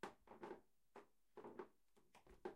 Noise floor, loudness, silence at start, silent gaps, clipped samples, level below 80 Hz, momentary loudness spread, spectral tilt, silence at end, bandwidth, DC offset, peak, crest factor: -77 dBFS; -61 LUFS; 0.05 s; none; under 0.1%; -82 dBFS; 9 LU; -5 dB/octave; 0 s; 16 kHz; under 0.1%; -36 dBFS; 24 dB